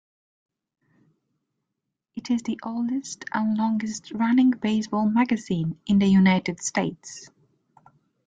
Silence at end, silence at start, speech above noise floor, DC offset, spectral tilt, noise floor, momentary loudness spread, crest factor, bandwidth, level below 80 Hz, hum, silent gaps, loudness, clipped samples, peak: 1 s; 2.15 s; 60 dB; under 0.1%; -5.5 dB/octave; -83 dBFS; 12 LU; 18 dB; 9.4 kHz; -62 dBFS; none; none; -24 LUFS; under 0.1%; -8 dBFS